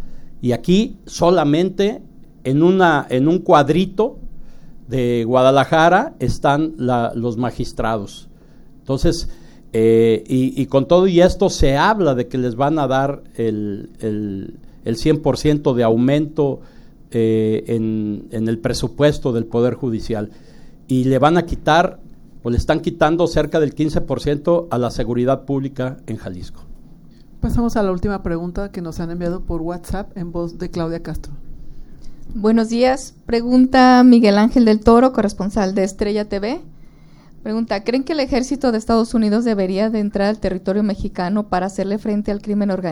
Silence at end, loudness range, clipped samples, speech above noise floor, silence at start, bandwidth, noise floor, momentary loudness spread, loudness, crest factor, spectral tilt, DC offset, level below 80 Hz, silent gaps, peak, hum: 0 s; 9 LU; under 0.1%; 26 dB; 0 s; 16 kHz; -43 dBFS; 13 LU; -17 LUFS; 18 dB; -6.5 dB/octave; under 0.1%; -34 dBFS; none; 0 dBFS; none